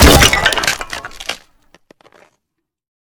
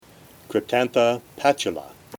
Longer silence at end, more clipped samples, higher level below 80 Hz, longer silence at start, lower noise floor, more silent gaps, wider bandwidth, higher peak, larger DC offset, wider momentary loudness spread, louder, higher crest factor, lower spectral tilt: first, 1.65 s vs 0 s; first, 0.5% vs under 0.1%; first, -22 dBFS vs -64 dBFS; second, 0 s vs 0.5 s; first, -76 dBFS vs -49 dBFS; neither; about the same, over 20 kHz vs 18.5 kHz; first, 0 dBFS vs -4 dBFS; neither; first, 18 LU vs 8 LU; first, -12 LUFS vs -23 LUFS; about the same, 16 dB vs 20 dB; about the same, -3 dB/octave vs -4 dB/octave